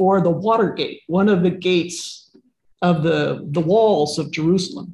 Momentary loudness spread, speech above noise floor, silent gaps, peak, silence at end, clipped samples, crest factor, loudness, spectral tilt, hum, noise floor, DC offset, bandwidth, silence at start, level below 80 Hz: 6 LU; 37 dB; none; -4 dBFS; 0 s; under 0.1%; 16 dB; -19 LUFS; -6 dB/octave; none; -55 dBFS; under 0.1%; 12 kHz; 0 s; -56 dBFS